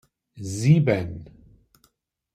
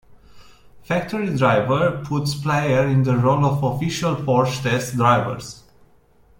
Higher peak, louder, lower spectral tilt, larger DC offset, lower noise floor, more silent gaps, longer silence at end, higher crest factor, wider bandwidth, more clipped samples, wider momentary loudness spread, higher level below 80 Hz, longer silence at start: about the same, -6 dBFS vs -4 dBFS; about the same, -22 LUFS vs -20 LUFS; about the same, -7 dB/octave vs -6.5 dB/octave; neither; first, -67 dBFS vs -54 dBFS; neither; first, 1.1 s vs 0.8 s; about the same, 20 dB vs 18 dB; second, 10.5 kHz vs 16.5 kHz; neither; first, 19 LU vs 7 LU; about the same, -54 dBFS vs -50 dBFS; first, 0.35 s vs 0.1 s